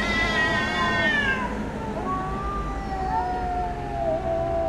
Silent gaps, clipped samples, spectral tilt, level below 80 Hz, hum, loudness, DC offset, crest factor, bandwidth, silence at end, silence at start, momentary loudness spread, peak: none; under 0.1%; -5 dB/octave; -36 dBFS; none; -25 LUFS; under 0.1%; 16 dB; 13.5 kHz; 0 s; 0 s; 9 LU; -10 dBFS